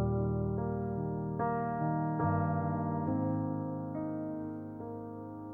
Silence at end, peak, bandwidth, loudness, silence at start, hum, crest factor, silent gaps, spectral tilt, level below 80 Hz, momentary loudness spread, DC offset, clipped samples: 0 s; -20 dBFS; 2.8 kHz; -35 LUFS; 0 s; none; 14 dB; none; -13 dB/octave; -54 dBFS; 11 LU; under 0.1%; under 0.1%